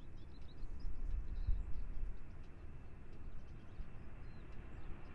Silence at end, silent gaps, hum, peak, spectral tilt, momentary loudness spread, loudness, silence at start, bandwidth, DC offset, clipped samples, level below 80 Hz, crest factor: 0 s; none; none; -24 dBFS; -8 dB/octave; 12 LU; -52 LUFS; 0 s; 5.4 kHz; under 0.1%; under 0.1%; -46 dBFS; 18 dB